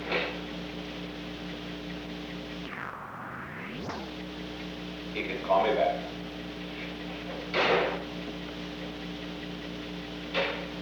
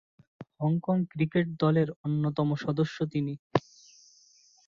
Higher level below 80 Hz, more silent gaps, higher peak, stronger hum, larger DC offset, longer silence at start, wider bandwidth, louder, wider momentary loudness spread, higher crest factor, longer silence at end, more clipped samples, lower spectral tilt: first, -52 dBFS vs -64 dBFS; second, none vs 1.96-2.04 s, 3.39-3.50 s; second, -12 dBFS vs -8 dBFS; first, 60 Hz at -55 dBFS vs none; neither; second, 0 s vs 0.4 s; first, over 20 kHz vs 7 kHz; second, -33 LUFS vs -29 LUFS; first, 12 LU vs 6 LU; about the same, 20 dB vs 22 dB; second, 0 s vs 1.1 s; neither; second, -5.5 dB/octave vs -8 dB/octave